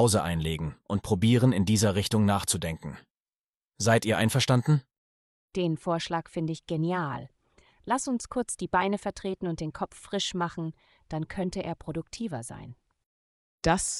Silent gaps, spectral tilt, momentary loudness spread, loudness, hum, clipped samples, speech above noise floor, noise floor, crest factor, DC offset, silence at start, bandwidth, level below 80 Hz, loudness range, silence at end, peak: 3.10-3.69 s, 4.98-5.48 s, 13.06-13.58 s; -5 dB/octave; 14 LU; -28 LUFS; none; under 0.1%; over 62 dB; under -90 dBFS; 20 dB; under 0.1%; 0 s; 13 kHz; -52 dBFS; 8 LU; 0 s; -10 dBFS